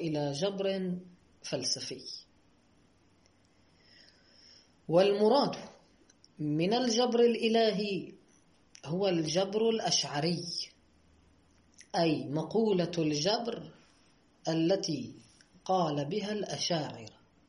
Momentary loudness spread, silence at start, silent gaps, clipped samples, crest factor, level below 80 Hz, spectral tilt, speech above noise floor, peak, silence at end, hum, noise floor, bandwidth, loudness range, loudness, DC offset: 17 LU; 0 s; none; under 0.1%; 18 dB; -72 dBFS; -4.5 dB/octave; 36 dB; -14 dBFS; 0.4 s; none; -66 dBFS; 11 kHz; 8 LU; -31 LUFS; under 0.1%